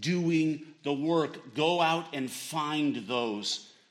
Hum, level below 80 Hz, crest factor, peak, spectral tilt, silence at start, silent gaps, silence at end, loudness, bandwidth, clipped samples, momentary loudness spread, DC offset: none; -78 dBFS; 16 dB; -14 dBFS; -5 dB/octave; 0 s; none; 0.2 s; -30 LUFS; 16 kHz; under 0.1%; 8 LU; under 0.1%